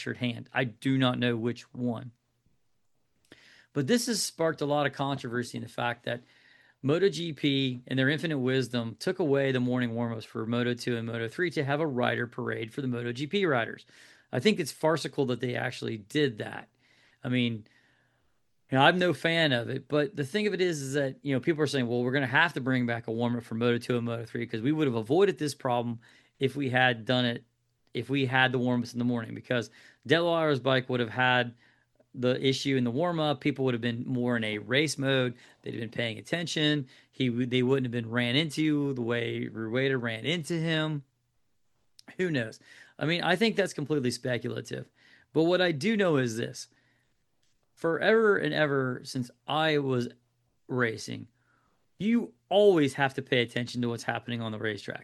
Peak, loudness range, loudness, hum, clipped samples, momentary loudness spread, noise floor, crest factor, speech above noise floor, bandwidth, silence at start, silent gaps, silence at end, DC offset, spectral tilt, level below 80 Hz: -4 dBFS; 4 LU; -29 LUFS; none; under 0.1%; 10 LU; -78 dBFS; 24 dB; 50 dB; 12.5 kHz; 0 s; none; 0 s; under 0.1%; -5.5 dB/octave; -72 dBFS